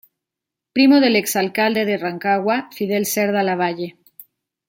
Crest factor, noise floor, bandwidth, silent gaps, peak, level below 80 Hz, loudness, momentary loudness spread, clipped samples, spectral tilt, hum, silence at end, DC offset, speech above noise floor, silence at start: 16 dB; -85 dBFS; 17 kHz; none; -2 dBFS; -68 dBFS; -18 LUFS; 9 LU; under 0.1%; -4 dB/octave; none; 0.45 s; under 0.1%; 67 dB; 0.75 s